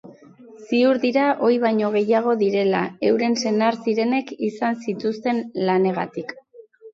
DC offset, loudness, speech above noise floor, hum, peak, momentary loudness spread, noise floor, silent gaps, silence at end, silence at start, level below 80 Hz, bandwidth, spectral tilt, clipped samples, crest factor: under 0.1%; -21 LUFS; 26 dB; none; -6 dBFS; 7 LU; -46 dBFS; none; 0.05 s; 0.05 s; -70 dBFS; 7.8 kHz; -6 dB/octave; under 0.1%; 16 dB